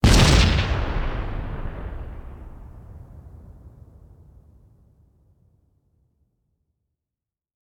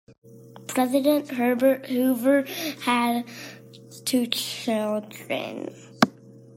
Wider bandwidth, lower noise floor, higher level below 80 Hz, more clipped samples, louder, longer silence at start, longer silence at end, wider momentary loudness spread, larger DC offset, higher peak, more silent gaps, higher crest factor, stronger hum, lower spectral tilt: about the same, 18 kHz vs 16.5 kHz; first, -89 dBFS vs -46 dBFS; first, -28 dBFS vs -74 dBFS; neither; about the same, -22 LUFS vs -24 LUFS; about the same, 0.05 s vs 0.1 s; first, 4 s vs 0.2 s; first, 29 LU vs 16 LU; neither; second, -4 dBFS vs 0 dBFS; second, none vs 0.18-0.22 s; about the same, 22 dB vs 24 dB; neither; about the same, -4.5 dB/octave vs -4 dB/octave